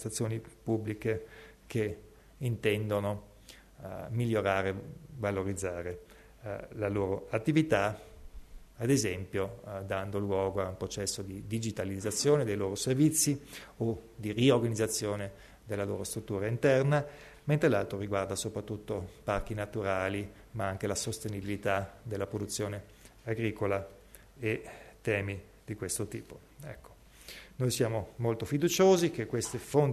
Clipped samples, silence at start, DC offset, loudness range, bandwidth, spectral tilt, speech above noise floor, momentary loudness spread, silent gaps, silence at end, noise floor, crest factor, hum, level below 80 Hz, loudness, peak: under 0.1%; 0 s; under 0.1%; 6 LU; 13.5 kHz; -5 dB/octave; 23 dB; 16 LU; none; 0 s; -55 dBFS; 20 dB; none; -56 dBFS; -32 LUFS; -12 dBFS